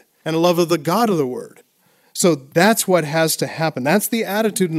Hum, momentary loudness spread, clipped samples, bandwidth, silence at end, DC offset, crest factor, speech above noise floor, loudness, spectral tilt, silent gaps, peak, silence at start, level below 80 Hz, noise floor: none; 7 LU; under 0.1%; 16 kHz; 0 s; under 0.1%; 18 dB; 41 dB; -18 LUFS; -4.5 dB/octave; none; 0 dBFS; 0.25 s; -68 dBFS; -59 dBFS